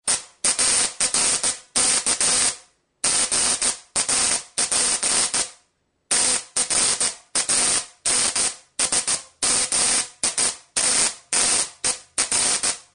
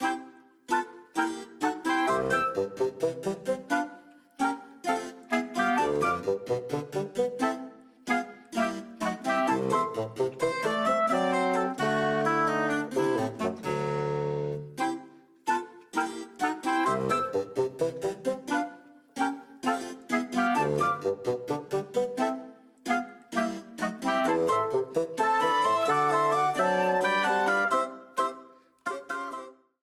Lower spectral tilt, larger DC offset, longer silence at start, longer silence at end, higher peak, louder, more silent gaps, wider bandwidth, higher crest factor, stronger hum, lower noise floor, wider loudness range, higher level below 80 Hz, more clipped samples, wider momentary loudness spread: second, 1 dB/octave vs -5 dB/octave; neither; about the same, 0.05 s vs 0 s; second, 0.15 s vs 0.3 s; first, -4 dBFS vs -14 dBFS; first, -19 LUFS vs -29 LUFS; neither; second, 10.5 kHz vs 15.5 kHz; about the same, 18 dB vs 16 dB; neither; first, -67 dBFS vs -52 dBFS; second, 1 LU vs 5 LU; first, -54 dBFS vs -66 dBFS; neither; second, 5 LU vs 9 LU